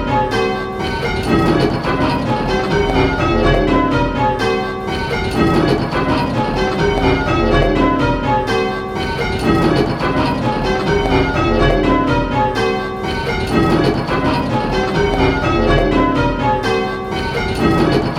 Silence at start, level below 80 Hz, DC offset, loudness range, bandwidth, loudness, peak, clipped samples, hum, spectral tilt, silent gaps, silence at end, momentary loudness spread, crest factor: 0 s; -26 dBFS; under 0.1%; 1 LU; 14.5 kHz; -16 LUFS; 0 dBFS; under 0.1%; none; -6.5 dB/octave; none; 0 s; 5 LU; 16 dB